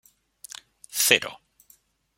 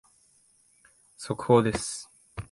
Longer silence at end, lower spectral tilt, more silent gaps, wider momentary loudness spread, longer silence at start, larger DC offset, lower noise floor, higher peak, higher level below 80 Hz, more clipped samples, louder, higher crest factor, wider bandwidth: first, 0.85 s vs 0.05 s; second, 0 dB/octave vs -5.5 dB/octave; neither; about the same, 22 LU vs 21 LU; second, 0.95 s vs 1.2 s; neither; about the same, -61 dBFS vs -64 dBFS; first, -2 dBFS vs -8 dBFS; second, -70 dBFS vs -54 dBFS; neither; first, -21 LUFS vs -26 LUFS; first, 28 dB vs 22 dB; first, 16.5 kHz vs 11.5 kHz